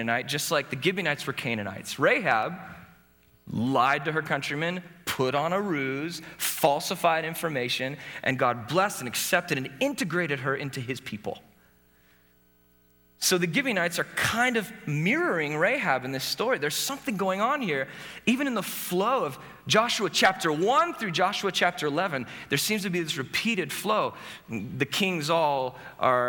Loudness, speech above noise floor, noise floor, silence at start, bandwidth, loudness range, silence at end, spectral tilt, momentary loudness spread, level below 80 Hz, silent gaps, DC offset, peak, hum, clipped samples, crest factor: -27 LUFS; 35 dB; -62 dBFS; 0 s; over 20 kHz; 4 LU; 0 s; -3.5 dB/octave; 10 LU; -66 dBFS; none; under 0.1%; -8 dBFS; 60 Hz at -60 dBFS; under 0.1%; 20 dB